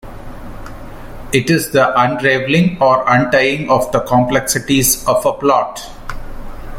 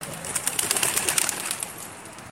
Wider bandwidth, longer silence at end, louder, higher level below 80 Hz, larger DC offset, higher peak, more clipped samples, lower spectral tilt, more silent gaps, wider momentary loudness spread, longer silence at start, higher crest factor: about the same, 17 kHz vs 17 kHz; about the same, 0 s vs 0 s; first, -13 LUFS vs -24 LUFS; first, -34 dBFS vs -58 dBFS; neither; about the same, 0 dBFS vs -2 dBFS; neither; first, -4.5 dB/octave vs -0.5 dB/octave; neither; first, 21 LU vs 16 LU; about the same, 0.05 s vs 0 s; second, 14 dB vs 26 dB